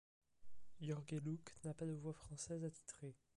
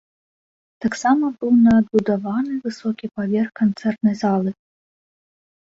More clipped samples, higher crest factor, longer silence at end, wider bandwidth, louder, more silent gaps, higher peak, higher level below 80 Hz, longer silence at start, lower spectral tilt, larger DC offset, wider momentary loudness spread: neither; about the same, 14 dB vs 16 dB; second, 0 s vs 1.25 s; first, 11.5 kHz vs 7.8 kHz; second, -49 LUFS vs -20 LUFS; neither; second, -36 dBFS vs -4 dBFS; second, -74 dBFS vs -56 dBFS; second, 0.2 s vs 0.8 s; about the same, -6 dB/octave vs -7 dB/octave; neither; second, 7 LU vs 12 LU